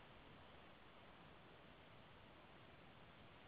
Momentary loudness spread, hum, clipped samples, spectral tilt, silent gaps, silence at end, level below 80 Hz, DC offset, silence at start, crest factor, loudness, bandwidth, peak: 1 LU; none; under 0.1%; -3.5 dB/octave; none; 0 s; -76 dBFS; under 0.1%; 0 s; 14 dB; -64 LUFS; 4.9 kHz; -50 dBFS